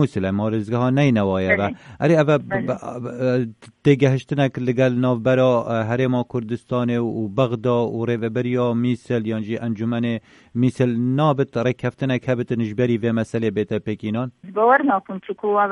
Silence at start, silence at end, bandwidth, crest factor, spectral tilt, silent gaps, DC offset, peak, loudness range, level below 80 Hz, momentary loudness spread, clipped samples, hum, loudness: 0 s; 0 s; 10.5 kHz; 16 dB; -8 dB/octave; none; under 0.1%; -4 dBFS; 3 LU; -58 dBFS; 8 LU; under 0.1%; none; -21 LUFS